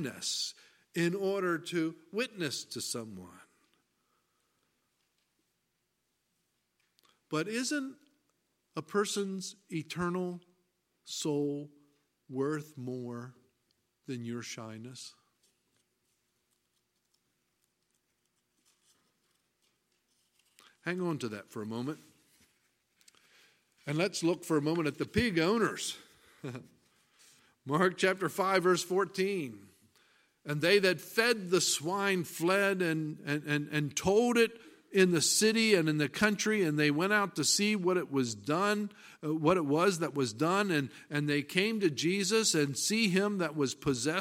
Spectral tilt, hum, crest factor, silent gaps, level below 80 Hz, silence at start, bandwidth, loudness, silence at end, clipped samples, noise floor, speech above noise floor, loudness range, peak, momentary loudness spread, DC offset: -4 dB/octave; none; 24 dB; none; -68 dBFS; 0 s; 16.5 kHz; -31 LUFS; 0 s; under 0.1%; -81 dBFS; 49 dB; 14 LU; -10 dBFS; 15 LU; under 0.1%